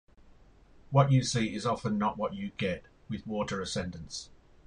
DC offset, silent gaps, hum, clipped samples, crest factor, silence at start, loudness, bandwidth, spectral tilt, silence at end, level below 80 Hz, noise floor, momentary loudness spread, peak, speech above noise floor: under 0.1%; none; none; under 0.1%; 22 dB; 0.9 s; -31 LUFS; 10.5 kHz; -5.5 dB/octave; 0.4 s; -56 dBFS; -57 dBFS; 16 LU; -10 dBFS; 27 dB